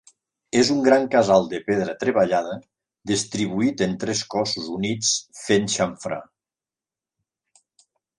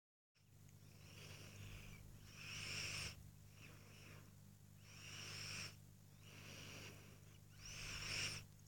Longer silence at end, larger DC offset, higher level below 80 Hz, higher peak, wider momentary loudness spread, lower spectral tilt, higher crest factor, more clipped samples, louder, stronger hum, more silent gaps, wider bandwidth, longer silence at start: first, 1.95 s vs 0 s; neither; first, -58 dBFS vs -68 dBFS; first, -2 dBFS vs -32 dBFS; second, 10 LU vs 18 LU; first, -4 dB/octave vs -2 dB/octave; about the same, 20 dB vs 22 dB; neither; first, -22 LUFS vs -52 LUFS; second, none vs 50 Hz at -60 dBFS; neither; second, 11.5 kHz vs 17 kHz; first, 0.55 s vs 0.35 s